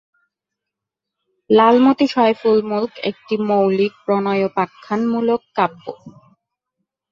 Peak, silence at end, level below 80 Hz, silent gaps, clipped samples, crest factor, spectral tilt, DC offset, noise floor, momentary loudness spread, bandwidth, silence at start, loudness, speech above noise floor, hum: 0 dBFS; 1 s; -64 dBFS; none; under 0.1%; 18 dB; -7.5 dB/octave; under 0.1%; -83 dBFS; 10 LU; 7.4 kHz; 1.5 s; -17 LUFS; 67 dB; none